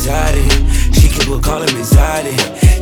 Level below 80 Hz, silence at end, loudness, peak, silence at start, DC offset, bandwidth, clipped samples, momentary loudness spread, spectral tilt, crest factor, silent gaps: -12 dBFS; 0 s; -13 LUFS; 0 dBFS; 0 s; under 0.1%; 19.5 kHz; 0.2%; 4 LU; -4.5 dB/octave; 10 dB; none